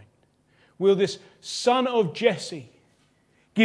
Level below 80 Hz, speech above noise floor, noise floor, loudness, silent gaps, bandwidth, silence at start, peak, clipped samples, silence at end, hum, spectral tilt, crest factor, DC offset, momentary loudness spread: -76 dBFS; 40 dB; -64 dBFS; -24 LUFS; none; 10.5 kHz; 0.8 s; -4 dBFS; under 0.1%; 0 s; none; -4.5 dB/octave; 20 dB; under 0.1%; 14 LU